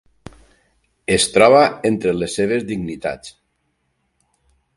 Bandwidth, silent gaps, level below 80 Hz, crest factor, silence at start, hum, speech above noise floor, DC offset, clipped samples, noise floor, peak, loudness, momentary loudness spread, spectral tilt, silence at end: 11.5 kHz; none; -50 dBFS; 20 dB; 1.1 s; none; 52 dB; under 0.1%; under 0.1%; -69 dBFS; 0 dBFS; -17 LUFS; 16 LU; -4 dB/octave; 1.45 s